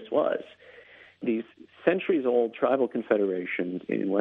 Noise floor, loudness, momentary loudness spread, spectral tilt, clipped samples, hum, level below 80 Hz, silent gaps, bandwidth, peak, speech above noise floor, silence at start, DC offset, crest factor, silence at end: -52 dBFS; -27 LUFS; 9 LU; -8.5 dB/octave; under 0.1%; none; -74 dBFS; none; 4 kHz; -8 dBFS; 26 dB; 0 s; under 0.1%; 20 dB; 0 s